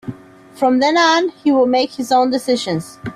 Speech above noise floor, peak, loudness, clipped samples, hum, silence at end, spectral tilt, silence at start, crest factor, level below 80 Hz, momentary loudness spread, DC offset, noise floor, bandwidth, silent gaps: 23 dB; -4 dBFS; -16 LUFS; under 0.1%; none; 0 s; -4.5 dB/octave; 0.05 s; 12 dB; -56 dBFS; 8 LU; under 0.1%; -38 dBFS; 14 kHz; none